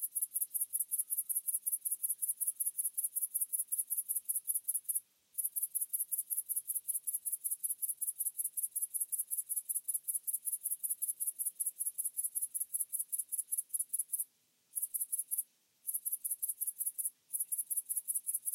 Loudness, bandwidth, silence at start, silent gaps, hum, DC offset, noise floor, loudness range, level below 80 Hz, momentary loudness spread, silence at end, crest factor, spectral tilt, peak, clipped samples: -35 LUFS; 16.5 kHz; 0 s; none; none; under 0.1%; -70 dBFS; 3 LU; under -90 dBFS; 4 LU; 0 s; 20 dB; 3.5 dB/octave; -18 dBFS; under 0.1%